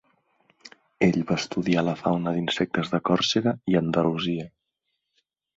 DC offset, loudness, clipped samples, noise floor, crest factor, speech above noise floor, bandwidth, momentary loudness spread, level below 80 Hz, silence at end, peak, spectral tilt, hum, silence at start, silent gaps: under 0.1%; -25 LUFS; under 0.1%; -79 dBFS; 18 dB; 55 dB; 7.8 kHz; 5 LU; -58 dBFS; 1.1 s; -8 dBFS; -5.5 dB/octave; none; 0.65 s; none